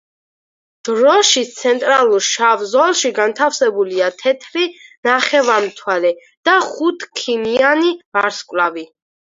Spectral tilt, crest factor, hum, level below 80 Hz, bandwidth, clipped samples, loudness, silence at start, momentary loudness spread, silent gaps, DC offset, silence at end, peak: -1 dB/octave; 16 dB; none; -68 dBFS; 7.8 kHz; under 0.1%; -15 LUFS; 0.85 s; 8 LU; 4.97-5.03 s, 6.37-6.43 s, 8.05-8.12 s; under 0.1%; 0.55 s; 0 dBFS